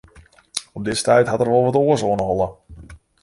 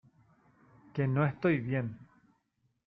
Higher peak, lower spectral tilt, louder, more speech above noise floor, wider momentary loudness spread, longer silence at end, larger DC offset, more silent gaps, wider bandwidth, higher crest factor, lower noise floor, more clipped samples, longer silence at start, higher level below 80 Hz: first, -2 dBFS vs -16 dBFS; second, -5 dB/octave vs -10.5 dB/octave; first, -19 LUFS vs -32 LUFS; second, 31 dB vs 46 dB; about the same, 12 LU vs 13 LU; second, 0.25 s vs 0.85 s; neither; neither; first, 11.5 kHz vs 5 kHz; about the same, 18 dB vs 18 dB; second, -49 dBFS vs -77 dBFS; neither; second, 0.55 s vs 0.95 s; first, -46 dBFS vs -68 dBFS